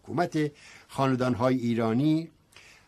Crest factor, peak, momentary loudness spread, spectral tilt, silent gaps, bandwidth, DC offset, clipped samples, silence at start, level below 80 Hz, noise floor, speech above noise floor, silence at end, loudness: 16 dB; -10 dBFS; 8 LU; -7.5 dB/octave; none; 13 kHz; under 0.1%; under 0.1%; 0.05 s; -64 dBFS; -55 dBFS; 28 dB; 0.6 s; -27 LUFS